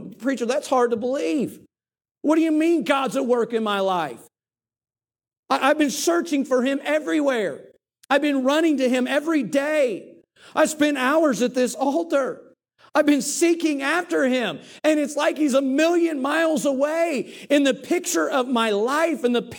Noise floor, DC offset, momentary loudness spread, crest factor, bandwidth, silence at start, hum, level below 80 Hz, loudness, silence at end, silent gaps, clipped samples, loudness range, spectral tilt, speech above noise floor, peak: under -90 dBFS; under 0.1%; 6 LU; 16 dB; 18 kHz; 0 s; none; -76 dBFS; -21 LUFS; 0 s; 2.11-2.15 s, 5.39-5.43 s; under 0.1%; 2 LU; -3.5 dB/octave; over 69 dB; -6 dBFS